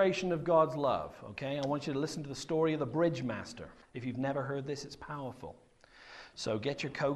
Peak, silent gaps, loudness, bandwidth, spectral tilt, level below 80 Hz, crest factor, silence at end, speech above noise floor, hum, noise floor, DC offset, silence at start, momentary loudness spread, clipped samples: -14 dBFS; none; -34 LUFS; 12.5 kHz; -6 dB/octave; -64 dBFS; 20 dB; 0 s; 22 dB; none; -56 dBFS; under 0.1%; 0 s; 17 LU; under 0.1%